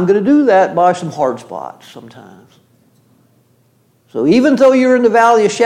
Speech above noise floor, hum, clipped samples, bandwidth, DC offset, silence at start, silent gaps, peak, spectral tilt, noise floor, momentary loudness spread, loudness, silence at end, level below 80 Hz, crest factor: 43 dB; none; under 0.1%; 11.5 kHz; under 0.1%; 0 s; none; -2 dBFS; -5.5 dB/octave; -55 dBFS; 18 LU; -11 LUFS; 0 s; -62 dBFS; 12 dB